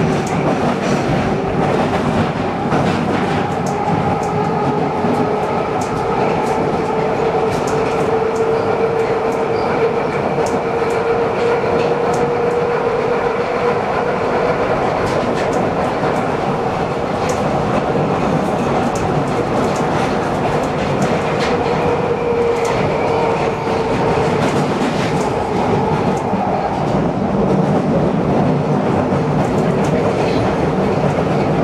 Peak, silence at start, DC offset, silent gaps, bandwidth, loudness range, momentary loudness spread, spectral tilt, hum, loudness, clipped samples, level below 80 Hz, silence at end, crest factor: -4 dBFS; 0 s; under 0.1%; none; 13 kHz; 1 LU; 2 LU; -6.5 dB/octave; none; -17 LUFS; under 0.1%; -38 dBFS; 0 s; 12 dB